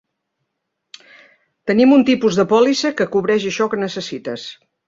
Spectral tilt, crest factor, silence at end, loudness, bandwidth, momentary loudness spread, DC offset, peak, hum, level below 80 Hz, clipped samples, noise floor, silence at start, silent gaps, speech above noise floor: -5 dB/octave; 16 dB; 0.35 s; -16 LUFS; 7.6 kHz; 16 LU; under 0.1%; -2 dBFS; none; -60 dBFS; under 0.1%; -76 dBFS; 1.65 s; none; 60 dB